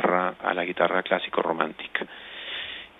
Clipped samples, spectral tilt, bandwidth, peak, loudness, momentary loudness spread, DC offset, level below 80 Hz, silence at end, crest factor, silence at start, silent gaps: under 0.1%; -7 dB/octave; 4.1 kHz; -4 dBFS; -27 LUFS; 10 LU; under 0.1%; -66 dBFS; 0.1 s; 24 dB; 0 s; none